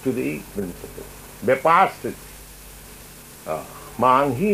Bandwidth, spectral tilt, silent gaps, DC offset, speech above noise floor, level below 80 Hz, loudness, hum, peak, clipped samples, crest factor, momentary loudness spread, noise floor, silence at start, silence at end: 15.5 kHz; -5.5 dB/octave; none; under 0.1%; 21 dB; -48 dBFS; -21 LUFS; none; -2 dBFS; under 0.1%; 20 dB; 24 LU; -42 dBFS; 0 s; 0 s